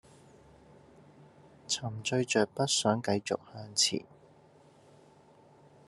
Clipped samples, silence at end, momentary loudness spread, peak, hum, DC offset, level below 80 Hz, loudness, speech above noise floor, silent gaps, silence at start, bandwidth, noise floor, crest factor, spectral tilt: under 0.1%; 1.85 s; 9 LU; -12 dBFS; none; under 0.1%; -74 dBFS; -30 LUFS; 29 dB; none; 1.7 s; 12.5 kHz; -60 dBFS; 22 dB; -3 dB/octave